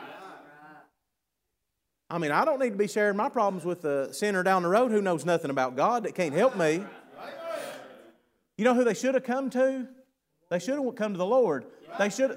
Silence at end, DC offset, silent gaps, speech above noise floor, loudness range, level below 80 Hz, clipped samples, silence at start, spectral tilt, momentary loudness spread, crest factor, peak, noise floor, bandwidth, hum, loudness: 0 s; under 0.1%; none; 57 dB; 3 LU; -82 dBFS; under 0.1%; 0 s; -5.5 dB/octave; 17 LU; 18 dB; -10 dBFS; -83 dBFS; 16 kHz; none; -27 LUFS